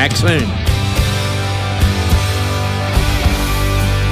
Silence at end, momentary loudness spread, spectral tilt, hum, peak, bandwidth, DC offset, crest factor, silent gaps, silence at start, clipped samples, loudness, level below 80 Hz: 0 s; 3 LU; -5 dB/octave; none; -2 dBFS; 16 kHz; under 0.1%; 12 dB; none; 0 s; under 0.1%; -16 LUFS; -20 dBFS